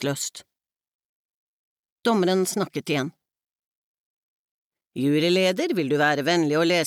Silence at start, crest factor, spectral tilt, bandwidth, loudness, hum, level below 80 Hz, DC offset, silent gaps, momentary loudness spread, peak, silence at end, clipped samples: 0 s; 16 dB; -4.5 dB/octave; 17 kHz; -23 LUFS; none; -80 dBFS; under 0.1%; 0.88-0.99 s, 1.05-1.84 s, 1.92-1.98 s, 3.50-4.72 s, 4.87-4.91 s; 9 LU; -10 dBFS; 0 s; under 0.1%